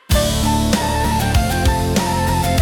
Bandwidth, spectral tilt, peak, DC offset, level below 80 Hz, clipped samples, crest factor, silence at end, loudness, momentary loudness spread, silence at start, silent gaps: 18 kHz; -5 dB/octave; -2 dBFS; under 0.1%; -22 dBFS; under 0.1%; 14 dB; 0 s; -17 LUFS; 1 LU; 0.1 s; none